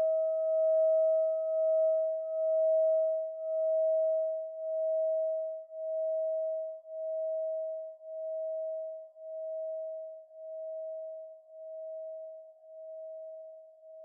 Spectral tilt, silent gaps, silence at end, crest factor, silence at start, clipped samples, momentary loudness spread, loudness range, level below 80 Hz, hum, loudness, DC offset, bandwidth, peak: -4.5 dB/octave; none; 0 s; 10 dB; 0 s; under 0.1%; 19 LU; 15 LU; under -90 dBFS; none; -32 LUFS; under 0.1%; 1.4 kHz; -22 dBFS